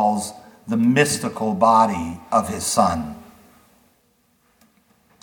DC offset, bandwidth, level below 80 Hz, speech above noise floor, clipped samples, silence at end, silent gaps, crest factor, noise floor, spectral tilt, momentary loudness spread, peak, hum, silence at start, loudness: under 0.1%; 19 kHz; -52 dBFS; 44 dB; under 0.1%; 2 s; none; 20 dB; -63 dBFS; -4.5 dB/octave; 16 LU; -2 dBFS; none; 0 s; -20 LUFS